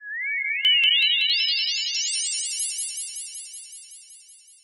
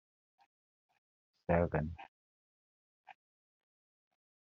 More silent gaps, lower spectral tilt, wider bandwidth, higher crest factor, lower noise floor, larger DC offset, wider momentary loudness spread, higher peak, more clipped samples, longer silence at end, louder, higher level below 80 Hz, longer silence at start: second, none vs 2.08-3.04 s; second, 7.5 dB/octave vs -8 dB/octave; first, 17 kHz vs 5.2 kHz; second, 16 dB vs 24 dB; second, -50 dBFS vs under -90 dBFS; neither; about the same, 20 LU vs 21 LU; first, -8 dBFS vs -18 dBFS; neither; second, 0.3 s vs 1.45 s; first, -21 LUFS vs -36 LUFS; second, -84 dBFS vs -62 dBFS; second, 0 s vs 1.5 s